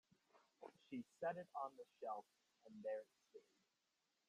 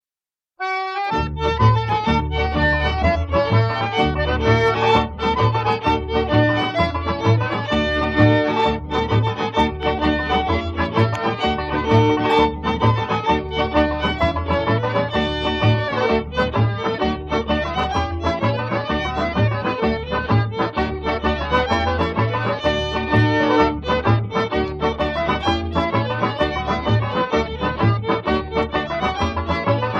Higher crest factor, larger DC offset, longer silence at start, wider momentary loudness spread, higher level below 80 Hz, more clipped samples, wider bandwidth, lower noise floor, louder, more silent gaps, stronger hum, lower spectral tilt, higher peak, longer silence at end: about the same, 20 dB vs 16 dB; neither; second, 0.35 s vs 0.6 s; first, 18 LU vs 5 LU; second, under -90 dBFS vs -32 dBFS; neither; first, 12 kHz vs 7.4 kHz; about the same, -88 dBFS vs under -90 dBFS; second, -52 LUFS vs -20 LUFS; neither; neither; about the same, -6.5 dB/octave vs -7 dB/octave; second, -34 dBFS vs -2 dBFS; first, 0.9 s vs 0 s